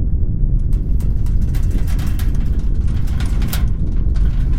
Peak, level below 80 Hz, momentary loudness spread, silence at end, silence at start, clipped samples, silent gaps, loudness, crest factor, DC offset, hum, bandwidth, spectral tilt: -2 dBFS; -16 dBFS; 2 LU; 0 s; 0 s; under 0.1%; none; -20 LUFS; 12 dB; 7%; none; 16.5 kHz; -7 dB/octave